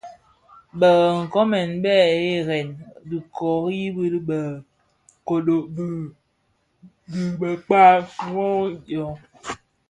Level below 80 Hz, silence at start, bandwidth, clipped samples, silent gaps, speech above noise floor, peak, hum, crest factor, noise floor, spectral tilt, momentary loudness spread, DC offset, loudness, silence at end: -60 dBFS; 0.05 s; 11 kHz; under 0.1%; none; 48 dB; 0 dBFS; none; 20 dB; -68 dBFS; -6.5 dB/octave; 19 LU; under 0.1%; -21 LUFS; 0.35 s